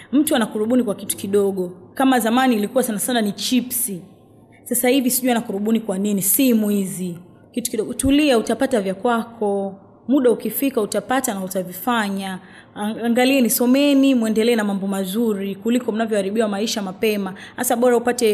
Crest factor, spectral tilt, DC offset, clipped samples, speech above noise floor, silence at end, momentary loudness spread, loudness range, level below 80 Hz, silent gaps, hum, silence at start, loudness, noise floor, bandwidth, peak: 14 dB; -4 dB/octave; under 0.1%; under 0.1%; 29 dB; 0 s; 10 LU; 3 LU; -52 dBFS; none; none; 0 s; -19 LUFS; -48 dBFS; 15.5 kHz; -6 dBFS